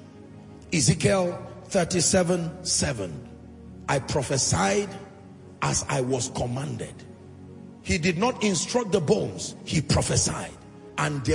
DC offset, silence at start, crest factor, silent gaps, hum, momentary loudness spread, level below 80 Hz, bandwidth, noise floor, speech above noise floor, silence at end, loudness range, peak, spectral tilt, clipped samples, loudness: under 0.1%; 0 s; 20 dB; none; none; 23 LU; -48 dBFS; 11 kHz; -46 dBFS; 21 dB; 0 s; 4 LU; -6 dBFS; -4 dB/octave; under 0.1%; -25 LUFS